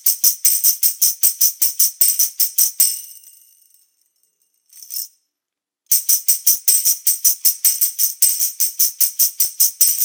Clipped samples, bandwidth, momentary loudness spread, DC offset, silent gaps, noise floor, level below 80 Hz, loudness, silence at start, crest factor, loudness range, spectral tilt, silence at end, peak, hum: under 0.1%; over 20 kHz; 4 LU; under 0.1%; none; -85 dBFS; -80 dBFS; -13 LUFS; 0.05 s; 18 dB; 8 LU; 7 dB/octave; 0 s; 0 dBFS; none